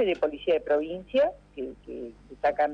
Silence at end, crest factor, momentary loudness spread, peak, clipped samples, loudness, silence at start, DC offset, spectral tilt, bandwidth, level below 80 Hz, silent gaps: 0 s; 14 dB; 14 LU; -14 dBFS; under 0.1%; -27 LUFS; 0 s; under 0.1%; -6 dB/octave; 6.6 kHz; -56 dBFS; none